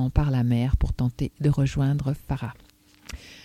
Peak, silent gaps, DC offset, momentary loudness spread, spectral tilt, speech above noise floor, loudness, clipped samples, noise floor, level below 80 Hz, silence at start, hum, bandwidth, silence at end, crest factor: -6 dBFS; none; under 0.1%; 15 LU; -8 dB/octave; 19 dB; -25 LUFS; under 0.1%; -43 dBFS; -32 dBFS; 0 s; none; 13 kHz; 0.05 s; 18 dB